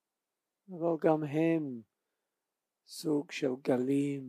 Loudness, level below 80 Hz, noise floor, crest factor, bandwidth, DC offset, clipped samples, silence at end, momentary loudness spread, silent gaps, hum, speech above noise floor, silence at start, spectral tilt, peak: -32 LUFS; under -90 dBFS; -89 dBFS; 20 dB; 15 kHz; under 0.1%; under 0.1%; 0 s; 15 LU; none; none; 58 dB; 0.7 s; -7 dB/octave; -14 dBFS